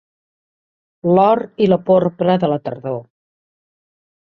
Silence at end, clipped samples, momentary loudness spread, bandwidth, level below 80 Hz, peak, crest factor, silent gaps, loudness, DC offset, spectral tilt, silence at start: 1.2 s; under 0.1%; 12 LU; 5.8 kHz; -60 dBFS; -2 dBFS; 16 dB; none; -16 LUFS; under 0.1%; -10 dB/octave; 1.05 s